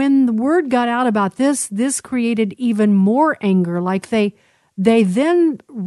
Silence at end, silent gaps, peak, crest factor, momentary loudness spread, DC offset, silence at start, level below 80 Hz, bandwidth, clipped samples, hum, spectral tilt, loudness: 0 s; none; -2 dBFS; 14 dB; 5 LU; under 0.1%; 0 s; -62 dBFS; 12 kHz; under 0.1%; none; -6 dB/octave; -17 LUFS